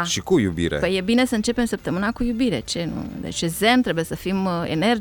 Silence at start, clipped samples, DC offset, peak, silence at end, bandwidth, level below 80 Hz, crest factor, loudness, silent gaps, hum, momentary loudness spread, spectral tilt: 0 s; under 0.1%; under 0.1%; -4 dBFS; 0 s; 18 kHz; -42 dBFS; 18 dB; -22 LUFS; none; none; 8 LU; -4.5 dB/octave